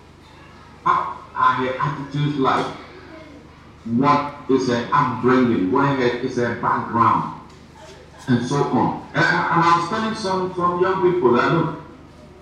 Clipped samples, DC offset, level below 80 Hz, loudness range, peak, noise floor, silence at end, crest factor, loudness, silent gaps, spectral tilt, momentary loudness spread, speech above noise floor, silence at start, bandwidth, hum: under 0.1%; under 0.1%; -52 dBFS; 4 LU; -4 dBFS; -45 dBFS; 0.1 s; 16 dB; -20 LUFS; none; -6.5 dB/octave; 11 LU; 26 dB; 0.4 s; 10 kHz; none